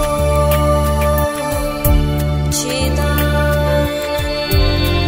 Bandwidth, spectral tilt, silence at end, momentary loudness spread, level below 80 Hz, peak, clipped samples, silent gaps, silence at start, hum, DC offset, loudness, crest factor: 16.5 kHz; -5 dB/octave; 0 s; 4 LU; -20 dBFS; -2 dBFS; under 0.1%; none; 0 s; none; under 0.1%; -16 LUFS; 14 dB